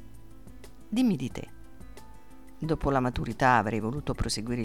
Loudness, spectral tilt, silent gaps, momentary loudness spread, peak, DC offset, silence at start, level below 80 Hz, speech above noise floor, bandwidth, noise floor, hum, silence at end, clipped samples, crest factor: -28 LUFS; -5.5 dB/octave; none; 15 LU; -10 dBFS; 0.5%; 0 s; -44 dBFS; 24 dB; 15.5 kHz; -52 dBFS; none; 0 s; under 0.1%; 20 dB